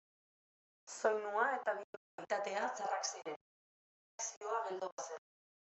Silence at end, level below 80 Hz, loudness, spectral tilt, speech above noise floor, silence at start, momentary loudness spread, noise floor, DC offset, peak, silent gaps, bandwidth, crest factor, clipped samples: 0.6 s; under -90 dBFS; -40 LUFS; -1 dB/octave; over 51 dB; 0.85 s; 17 LU; under -90 dBFS; under 0.1%; -20 dBFS; 1.84-2.18 s, 3.36-4.18 s, 4.37-4.41 s, 4.92-4.98 s; 8.2 kHz; 20 dB; under 0.1%